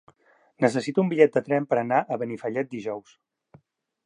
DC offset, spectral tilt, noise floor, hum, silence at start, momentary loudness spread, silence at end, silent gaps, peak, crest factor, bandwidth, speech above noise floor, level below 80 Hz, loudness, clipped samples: under 0.1%; -7 dB/octave; -61 dBFS; none; 0.6 s; 12 LU; 1.05 s; none; -4 dBFS; 22 dB; 10.5 kHz; 37 dB; -74 dBFS; -25 LUFS; under 0.1%